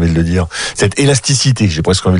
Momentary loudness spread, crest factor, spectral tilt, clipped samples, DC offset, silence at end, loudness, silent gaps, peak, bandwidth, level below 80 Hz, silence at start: 4 LU; 12 dB; -4.5 dB/octave; under 0.1%; under 0.1%; 0 s; -13 LUFS; none; 0 dBFS; 11 kHz; -30 dBFS; 0 s